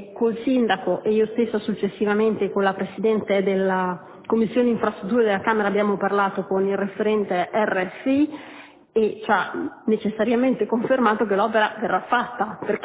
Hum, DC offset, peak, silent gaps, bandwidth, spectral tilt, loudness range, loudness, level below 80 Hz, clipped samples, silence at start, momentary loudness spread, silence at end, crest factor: none; under 0.1%; -4 dBFS; none; 4 kHz; -10 dB/octave; 2 LU; -22 LUFS; -62 dBFS; under 0.1%; 0 s; 5 LU; 0 s; 16 dB